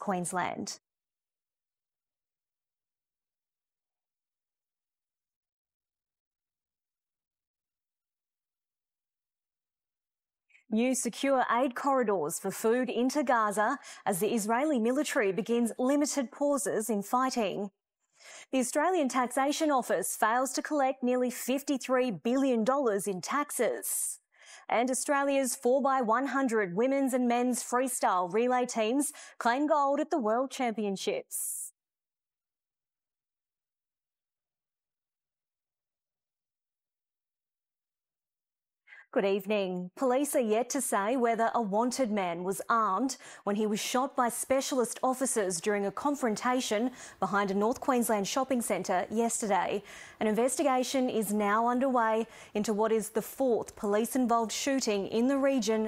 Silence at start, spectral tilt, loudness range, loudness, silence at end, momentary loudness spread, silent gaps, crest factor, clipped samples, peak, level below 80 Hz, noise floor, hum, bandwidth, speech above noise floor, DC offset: 0 s; -3.5 dB/octave; 6 LU; -30 LUFS; 0 s; 6 LU; 5.36-5.41 s, 5.52-5.65 s, 5.74-5.80 s, 6.20-6.31 s, 7.47-7.54 s; 20 dB; under 0.1%; -12 dBFS; -74 dBFS; under -90 dBFS; none; 16 kHz; over 61 dB; under 0.1%